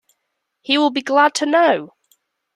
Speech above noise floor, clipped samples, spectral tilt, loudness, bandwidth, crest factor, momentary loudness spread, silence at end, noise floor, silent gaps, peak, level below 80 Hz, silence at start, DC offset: 59 dB; under 0.1%; -2.5 dB/octave; -16 LUFS; 13 kHz; 16 dB; 7 LU; 0.7 s; -75 dBFS; none; -2 dBFS; -72 dBFS; 0.7 s; under 0.1%